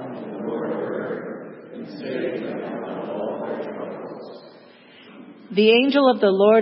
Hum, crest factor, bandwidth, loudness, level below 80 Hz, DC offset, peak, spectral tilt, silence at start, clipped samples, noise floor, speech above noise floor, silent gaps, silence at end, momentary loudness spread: none; 18 dB; 5.8 kHz; -22 LUFS; -78 dBFS; under 0.1%; -4 dBFS; -10 dB/octave; 0 s; under 0.1%; -48 dBFS; 31 dB; none; 0 s; 22 LU